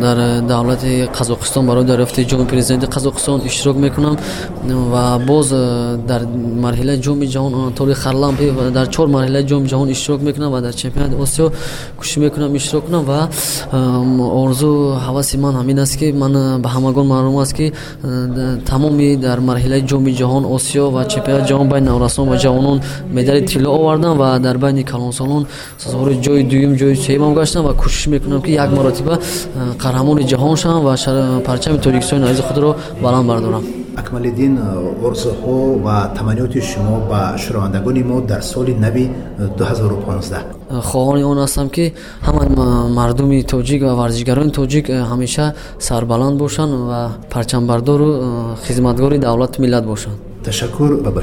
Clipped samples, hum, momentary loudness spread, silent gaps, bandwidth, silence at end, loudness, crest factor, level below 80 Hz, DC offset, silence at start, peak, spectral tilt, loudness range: under 0.1%; none; 7 LU; none; 17 kHz; 0 s; -15 LUFS; 14 dB; -28 dBFS; under 0.1%; 0 s; 0 dBFS; -6 dB/octave; 3 LU